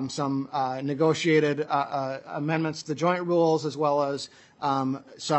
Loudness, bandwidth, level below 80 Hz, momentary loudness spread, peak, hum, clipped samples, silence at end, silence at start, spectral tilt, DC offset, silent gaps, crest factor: -26 LUFS; 8.4 kHz; -76 dBFS; 9 LU; -8 dBFS; none; under 0.1%; 0 s; 0 s; -5.5 dB/octave; under 0.1%; none; 18 dB